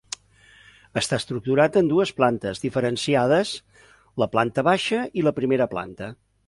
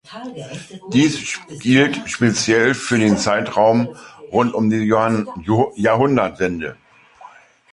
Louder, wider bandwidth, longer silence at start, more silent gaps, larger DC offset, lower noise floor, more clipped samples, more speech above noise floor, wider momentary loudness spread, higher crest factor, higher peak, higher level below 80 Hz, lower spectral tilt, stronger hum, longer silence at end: second, -22 LUFS vs -17 LUFS; about the same, 11.5 kHz vs 11.5 kHz; first, 0.95 s vs 0.1 s; neither; neither; first, -54 dBFS vs -44 dBFS; neither; first, 32 dB vs 27 dB; about the same, 16 LU vs 16 LU; about the same, 18 dB vs 16 dB; about the same, -4 dBFS vs -2 dBFS; second, -56 dBFS vs -50 dBFS; about the same, -5 dB/octave vs -5 dB/octave; neither; about the same, 0.35 s vs 0.45 s